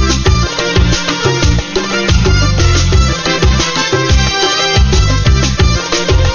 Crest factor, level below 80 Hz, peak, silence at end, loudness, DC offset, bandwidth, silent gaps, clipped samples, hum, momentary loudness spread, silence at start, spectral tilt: 10 dB; -14 dBFS; 0 dBFS; 0 s; -11 LUFS; under 0.1%; 7.2 kHz; none; under 0.1%; none; 3 LU; 0 s; -4 dB/octave